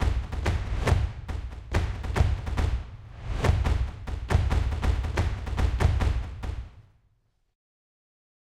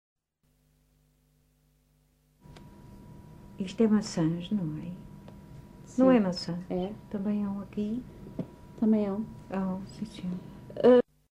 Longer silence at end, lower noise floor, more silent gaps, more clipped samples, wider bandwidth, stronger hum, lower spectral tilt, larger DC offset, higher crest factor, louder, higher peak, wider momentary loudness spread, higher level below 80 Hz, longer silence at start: first, 1.75 s vs 0.3 s; about the same, -68 dBFS vs -71 dBFS; neither; neither; about the same, 12 kHz vs 11 kHz; second, none vs 50 Hz at -55 dBFS; about the same, -6.5 dB/octave vs -7 dB/octave; neither; about the same, 18 dB vs 20 dB; about the same, -29 LUFS vs -29 LUFS; about the same, -10 dBFS vs -12 dBFS; second, 12 LU vs 26 LU; first, -30 dBFS vs -58 dBFS; second, 0 s vs 2.5 s